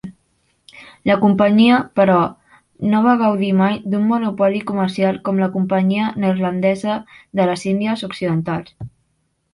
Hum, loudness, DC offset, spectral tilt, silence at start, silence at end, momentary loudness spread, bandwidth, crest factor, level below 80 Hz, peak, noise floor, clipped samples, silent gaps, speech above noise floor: none; -17 LUFS; under 0.1%; -7.5 dB/octave; 0.05 s; 0.65 s; 11 LU; 11.5 kHz; 18 dB; -56 dBFS; 0 dBFS; -67 dBFS; under 0.1%; none; 50 dB